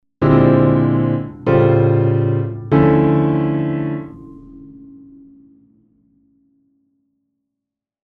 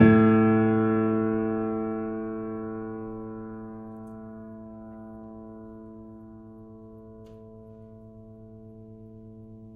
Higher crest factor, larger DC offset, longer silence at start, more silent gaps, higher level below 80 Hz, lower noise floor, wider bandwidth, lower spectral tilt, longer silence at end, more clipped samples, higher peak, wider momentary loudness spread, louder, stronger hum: about the same, 18 dB vs 22 dB; neither; first, 0.2 s vs 0 s; neither; first, -42 dBFS vs -54 dBFS; first, -82 dBFS vs -47 dBFS; first, 4.6 kHz vs 3.7 kHz; about the same, -11.5 dB/octave vs -11.5 dB/octave; first, 3.35 s vs 0 s; neither; first, 0 dBFS vs -6 dBFS; second, 9 LU vs 25 LU; first, -15 LUFS vs -25 LUFS; neither